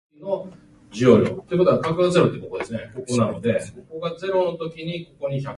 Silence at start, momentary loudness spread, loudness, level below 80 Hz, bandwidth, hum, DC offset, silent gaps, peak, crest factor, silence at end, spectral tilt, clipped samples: 0.2 s; 14 LU; -22 LUFS; -54 dBFS; 11.5 kHz; none; under 0.1%; none; -2 dBFS; 20 dB; 0 s; -6.5 dB/octave; under 0.1%